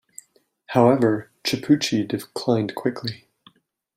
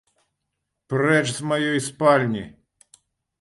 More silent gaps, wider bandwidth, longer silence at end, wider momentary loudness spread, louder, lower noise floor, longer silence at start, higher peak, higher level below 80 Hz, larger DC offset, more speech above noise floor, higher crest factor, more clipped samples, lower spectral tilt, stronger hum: neither; first, 16 kHz vs 11.5 kHz; about the same, 0.8 s vs 0.9 s; about the same, 12 LU vs 10 LU; about the same, -22 LUFS vs -21 LUFS; second, -58 dBFS vs -79 dBFS; second, 0.7 s vs 0.9 s; about the same, -2 dBFS vs -4 dBFS; about the same, -62 dBFS vs -62 dBFS; neither; second, 38 dB vs 58 dB; about the same, 20 dB vs 20 dB; neither; about the same, -5.5 dB/octave vs -5 dB/octave; neither